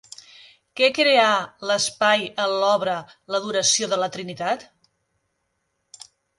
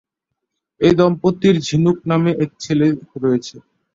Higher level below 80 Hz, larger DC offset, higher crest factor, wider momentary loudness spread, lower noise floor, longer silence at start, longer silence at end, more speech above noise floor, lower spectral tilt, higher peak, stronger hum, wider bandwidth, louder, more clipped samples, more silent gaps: second, -70 dBFS vs -50 dBFS; neither; about the same, 20 dB vs 16 dB; first, 13 LU vs 7 LU; second, -74 dBFS vs -78 dBFS; about the same, 0.75 s vs 0.8 s; first, 1.75 s vs 0.35 s; second, 53 dB vs 62 dB; second, -1.5 dB/octave vs -7 dB/octave; about the same, -4 dBFS vs -2 dBFS; neither; first, 11.5 kHz vs 7.8 kHz; second, -21 LUFS vs -17 LUFS; neither; neither